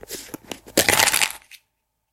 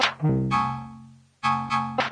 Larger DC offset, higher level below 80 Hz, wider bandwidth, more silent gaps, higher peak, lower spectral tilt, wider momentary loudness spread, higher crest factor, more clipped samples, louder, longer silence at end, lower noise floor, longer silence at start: neither; about the same, -52 dBFS vs -50 dBFS; first, over 20 kHz vs 10.5 kHz; neither; first, 0 dBFS vs -8 dBFS; second, -0.5 dB/octave vs -5.5 dB/octave; first, 21 LU vs 10 LU; first, 24 dB vs 18 dB; neither; first, -18 LUFS vs -25 LUFS; first, 0.75 s vs 0 s; first, -74 dBFS vs -48 dBFS; about the same, 0.1 s vs 0 s